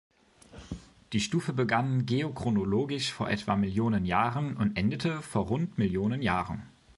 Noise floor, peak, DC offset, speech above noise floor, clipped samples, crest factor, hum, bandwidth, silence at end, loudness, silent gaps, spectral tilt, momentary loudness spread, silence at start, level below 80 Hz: -52 dBFS; -10 dBFS; under 0.1%; 24 dB; under 0.1%; 20 dB; none; 11.5 kHz; 0.3 s; -29 LUFS; none; -6 dB/octave; 7 LU; 0.55 s; -52 dBFS